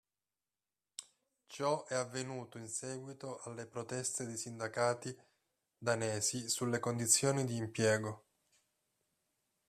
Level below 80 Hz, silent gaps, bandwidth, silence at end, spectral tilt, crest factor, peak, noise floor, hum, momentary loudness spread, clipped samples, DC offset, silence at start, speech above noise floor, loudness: -78 dBFS; none; 14 kHz; 1.5 s; -3.5 dB/octave; 24 dB; -14 dBFS; under -90 dBFS; none; 16 LU; under 0.1%; under 0.1%; 1 s; over 53 dB; -36 LUFS